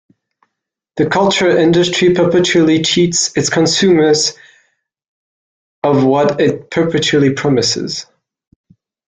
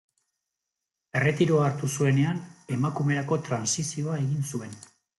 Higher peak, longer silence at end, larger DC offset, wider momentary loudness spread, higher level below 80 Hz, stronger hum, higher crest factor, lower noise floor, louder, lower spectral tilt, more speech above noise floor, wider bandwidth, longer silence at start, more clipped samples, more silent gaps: first, -2 dBFS vs -10 dBFS; first, 1.05 s vs 0.35 s; neither; second, 7 LU vs 11 LU; first, -50 dBFS vs -64 dBFS; neither; second, 12 dB vs 18 dB; second, -77 dBFS vs -86 dBFS; first, -12 LUFS vs -27 LUFS; second, -4 dB/octave vs -5.5 dB/octave; first, 65 dB vs 60 dB; second, 9.6 kHz vs 12 kHz; second, 0.95 s vs 1.15 s; neither; first, 5.08-5.82 s vs none